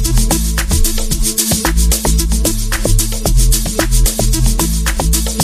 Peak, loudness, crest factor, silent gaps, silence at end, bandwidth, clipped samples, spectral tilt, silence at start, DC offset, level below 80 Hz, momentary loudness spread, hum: 0 dBFS; -14 LUFS; 12 dB; none; 0 s; 15.5 kHz; under 0.1%; -3.5 dB/octave; 0 s; under 0.1%; -14 dBFS; 3 LU; none